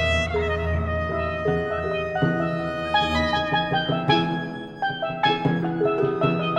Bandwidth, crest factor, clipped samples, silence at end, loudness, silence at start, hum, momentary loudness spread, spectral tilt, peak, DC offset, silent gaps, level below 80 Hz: 9.8 kHz; 18 dB; under 0.1%; 0 s; -23 LUFS; 0 s; none; 5 LU; -6.5 dB/octave; -6 dBFS; under 0.1%; none; -38 dBFS